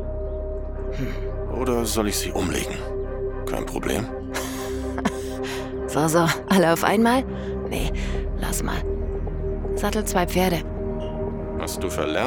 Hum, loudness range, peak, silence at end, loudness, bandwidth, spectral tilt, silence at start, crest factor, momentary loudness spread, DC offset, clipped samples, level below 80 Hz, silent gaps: none; 5 LU; -4 dBFS; 0 s; -25 LUFS; 18 kHz; -5 dB/octave; 0 s; 20 dB; 10 LU; under 0.1%; under 0.1%; -32 dBFS; none